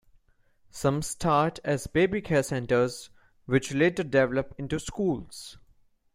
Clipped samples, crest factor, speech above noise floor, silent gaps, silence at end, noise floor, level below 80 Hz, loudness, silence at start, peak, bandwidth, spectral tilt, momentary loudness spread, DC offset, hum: under 0.1%; 20 dB; 37 dB; none; 0.6 s; -63 dBFS; -52 dBFS; -27 LUFS; 0.75 s; -8 dBFS; 16 kHz; -5.5 dB/octave; 12 LU; under 0.1%; none